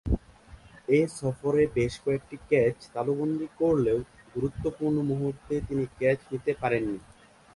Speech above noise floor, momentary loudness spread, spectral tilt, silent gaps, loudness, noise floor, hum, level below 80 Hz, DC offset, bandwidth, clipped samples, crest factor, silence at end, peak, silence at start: 24 dB; 8 LU; -7.5 dB/octave; none; -28 LUFS; -51 dBFS; none; -44 dBFS; under 0.1%; 11.5 kHz; under 0.1%; 18 dB; 0.55 s; -10 dBFS; 0.05 s